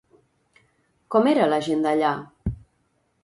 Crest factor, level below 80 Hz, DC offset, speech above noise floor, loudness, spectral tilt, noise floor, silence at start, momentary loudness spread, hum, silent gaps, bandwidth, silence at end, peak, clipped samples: 18 dB; -46 dBFS; under 0.1%; 48 dB; -22 LUFS; -6.5 dB/octave; -69 dBFS; 1.1 s; 14 LU; none; none; 11.5 kHz; 0.7 s; -6 dBFS; under 0.1%